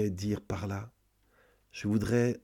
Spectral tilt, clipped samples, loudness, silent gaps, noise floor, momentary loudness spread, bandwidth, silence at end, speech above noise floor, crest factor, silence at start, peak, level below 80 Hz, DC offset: -7 dB/octave; under 0.1%; -33 LUFS; none; -68 dBFS; 16 LU; 16.5 kHz; 0.05 s; 37 dB; 16 dB; 0 s; -16 dBFS; -56 dBFS; under 0.1%